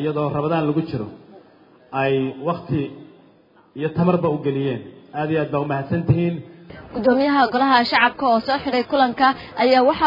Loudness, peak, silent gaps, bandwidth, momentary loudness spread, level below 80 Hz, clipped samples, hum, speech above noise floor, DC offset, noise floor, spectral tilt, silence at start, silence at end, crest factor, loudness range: -20 LUFS; -2 dBFS; none; 5.4 kHz; 15 LU; -54 dBFS; under 0.1%; none; 34 dB; under 0.1%; -53 dBFS; -8.5 dB/octave; 0 s; 0 s; 18 dB; 7 LU